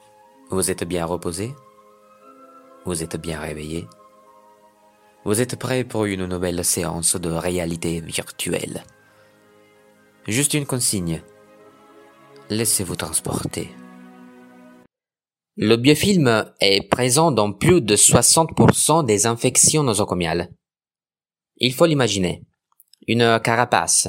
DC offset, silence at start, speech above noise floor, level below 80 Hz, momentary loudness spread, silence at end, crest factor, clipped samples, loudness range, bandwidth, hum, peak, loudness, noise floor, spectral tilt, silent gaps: under 0.1%; 0.5 s; over 71 dB; -48 dBFS; 15 LU; 0 s; 22 dB; under 0.1%; 12 LU; 16.5 kHz; none; 0 dBFS; -19 LUFS; under -90 dBFS; -3.5 dB/octave; none